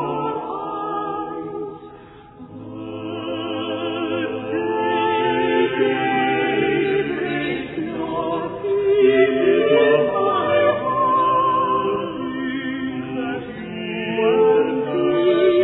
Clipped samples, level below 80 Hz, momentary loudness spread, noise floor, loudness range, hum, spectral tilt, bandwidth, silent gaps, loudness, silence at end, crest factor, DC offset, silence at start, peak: under 0.1%; -56 dBFS; 13 LU; -42 dBFS; 11 LU; none; -9.5 dB/octave; 4.1 kHz; none; -20 LUFS; 0 s; 16 dB; under 0.1%; 0 s; -4 dBFS